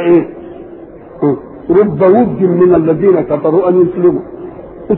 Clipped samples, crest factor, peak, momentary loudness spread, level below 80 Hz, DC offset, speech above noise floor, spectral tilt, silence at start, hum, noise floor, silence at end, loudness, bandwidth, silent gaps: under 0.1%; 10 dB; 0 dBFS; 20 LU; -44 dBFS; under 0.1%; 22 dB; -13 dB/octave; 0 s; none; -32 dBFS; 0 s; -11 LUFS; 3.8 kHz; none